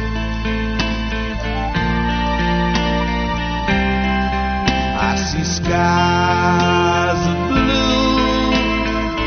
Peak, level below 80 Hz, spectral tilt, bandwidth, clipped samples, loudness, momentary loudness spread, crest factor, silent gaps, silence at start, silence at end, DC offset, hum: -2 dBFS; -26 dBFS; -4 dB/octave; 6.6 kHz; under 0.1%; -17 LUFS; 6 LU; 16 dB; none; 0 s; 0 s; under 0.1%; none